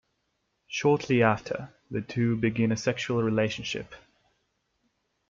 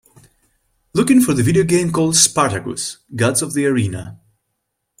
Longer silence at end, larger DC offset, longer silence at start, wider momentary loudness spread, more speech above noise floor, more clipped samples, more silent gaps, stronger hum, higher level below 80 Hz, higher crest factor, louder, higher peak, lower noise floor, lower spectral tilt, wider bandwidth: first, 1.3 s vs 0.85 s; neither; second, 0.7 s vs 0.95 s; about the same, 13 LU vs 13 LU; second, 50 dB vs 58 dB; neither; neither; neither; second, -62 dBFS vs -50 dBFS; about the same, 22 dB vs 18 dB; second, -27 LUFS vs -16 LUFS; second, -8 dBFS vs 0 dBFS; about the same, -77 dBFS vs -74 dBFS; first, -6 dB/octave vs -4 dB/octave; second, 7.6 kHz vs 16.5 kHz